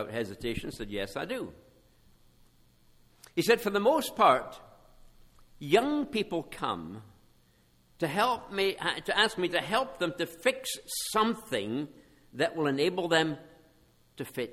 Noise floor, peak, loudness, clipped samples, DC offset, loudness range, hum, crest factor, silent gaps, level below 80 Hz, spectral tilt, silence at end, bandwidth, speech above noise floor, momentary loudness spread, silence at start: -65 dBFS; -10 dBFS; -30 LUFS; under 0.1%; under 0.1%; 5 LU; none; 22 dB; none; -58 dBFS; -4 dB/octave; 0 s; 18 kHz; 35 dB; 13 LU; 0 s